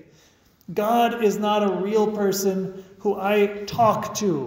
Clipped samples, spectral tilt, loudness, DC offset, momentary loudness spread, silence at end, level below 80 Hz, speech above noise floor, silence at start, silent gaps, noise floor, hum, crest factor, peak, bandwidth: under 0.1%; -5 dB/octave; -22 LUFS; under 0.1%; 7 LU; 0 s; -60 dBFS; 35 dB; 0.7 s; none; -57 dBFS; none; 16 dB; -6 dBFS; 16 kHz